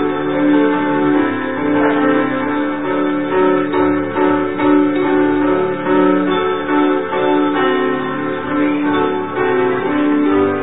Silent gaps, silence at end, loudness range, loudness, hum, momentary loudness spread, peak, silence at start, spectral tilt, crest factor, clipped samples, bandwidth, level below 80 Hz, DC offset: none; 0 s; 1 LU; -15 LUFS; none; 5 LU; -2 dBFS; 0 s; -11.5 dB/octave; 12 dB; under 0.1%; 4 kHz; -50 dBFS; 2%